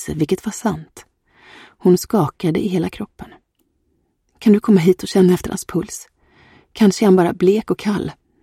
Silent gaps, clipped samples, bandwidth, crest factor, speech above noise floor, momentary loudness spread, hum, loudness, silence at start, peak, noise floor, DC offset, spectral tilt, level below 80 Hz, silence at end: none; under 0.1%; 15.5 kHz; 16 dB; 49 dB; 16 LU; none; -17 LUFS; 0 s; -2 dBFS; -66 dBFS; under 0.1%; -6.5 dB/octave; -48 dBFS; 0.3 s